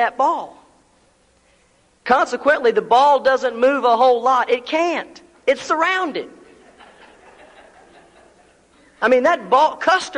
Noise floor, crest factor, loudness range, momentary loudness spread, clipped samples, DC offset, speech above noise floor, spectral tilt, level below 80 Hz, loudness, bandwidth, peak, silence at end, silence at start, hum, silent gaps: -57 dBFS; 16 dB; 9 LU; 12 LU; under 0.1%; under 0.1%; 41 dB; -3 dB/octave; -62 dBFS; -17 LUFS; 10.5 kHz; -2 dBFS; 0 s; 0 s; none; none